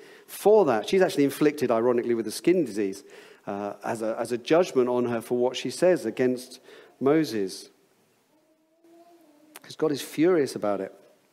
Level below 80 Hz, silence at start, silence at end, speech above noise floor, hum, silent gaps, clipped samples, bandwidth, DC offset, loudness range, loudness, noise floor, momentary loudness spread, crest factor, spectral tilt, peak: -74 dBFS; 0.3 s; 0.4 s; 40 dB; none; none; under 0.1%; 16 kHz; under 0.1%; 7 LU; -25 LUFS; -65 dBFS; 12 LU; 18 dB; -5.5 dB/octave; -8 dBFS